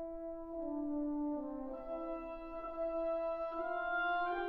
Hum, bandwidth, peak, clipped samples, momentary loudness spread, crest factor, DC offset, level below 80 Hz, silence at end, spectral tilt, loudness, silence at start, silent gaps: none; 5.2 kHz; -28 dBFS; under 0.1%; 9 LU; 12 dB; under 0.1%; -60 dBFS; 0 s; -7 dB/octave; -40 LUFS; 0 s; none